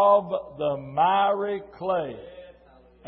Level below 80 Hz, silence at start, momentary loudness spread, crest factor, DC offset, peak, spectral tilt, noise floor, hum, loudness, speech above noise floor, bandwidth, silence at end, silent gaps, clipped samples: -60 dBFS; 0 s; 14 LU; 18 dB; under 0.1%; -8 dBFS; -9.5 dB/octave; -54 dBFS; none; -25 LUFS; 30 dB; 4.4 kHz; 0.55 s; none; under 0.1%